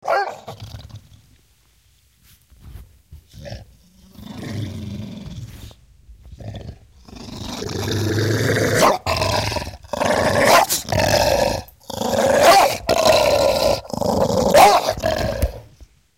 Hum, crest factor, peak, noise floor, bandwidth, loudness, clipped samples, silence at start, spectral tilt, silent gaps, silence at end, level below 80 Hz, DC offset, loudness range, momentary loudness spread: none; 18 dB; -2 dBFS; -57 dBFS; 17 kHz; -17 LUFS; under 0.1%; 0.05 s; -4 dB/octave; none; 0.35 s; -38 dBFS; under 0.1%; 19 LU; 24 LU